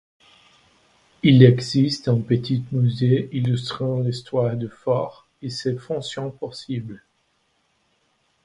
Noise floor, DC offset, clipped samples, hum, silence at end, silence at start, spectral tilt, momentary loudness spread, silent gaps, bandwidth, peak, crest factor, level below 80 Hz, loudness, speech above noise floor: -67 dBFS; under 0.1%; under 0.1%; none; 1.45 s; 1.25 s; -7.5 dB/octave; 16 LU; none; 10.5 kHz; 0 dBFS; 22 dB; -58 dBFS; -21 LUFS; 47 dB